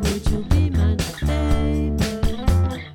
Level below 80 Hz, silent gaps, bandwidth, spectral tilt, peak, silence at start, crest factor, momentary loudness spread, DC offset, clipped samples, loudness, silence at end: -24 dBFS; none; 16.5 kHz; -6.5 dB/octave; -4 dBFS; 0 s; 14 dB; 3 LU; under 0.1%; under 0.1%; -22 LUFS; 0 s